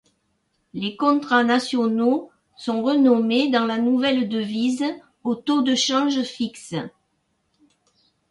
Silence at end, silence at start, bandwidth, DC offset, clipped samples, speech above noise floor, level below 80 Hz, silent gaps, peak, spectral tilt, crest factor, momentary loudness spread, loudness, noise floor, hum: 1.4 s; 0.75 s; 11.5 kHz; under 0.1%; under 0.1%; 50 dB; -68 dBFS; none; -6 dBFS; -4 dB/octave; 16 dB; 12 LU; -21 LUFS; -70 dBFS; none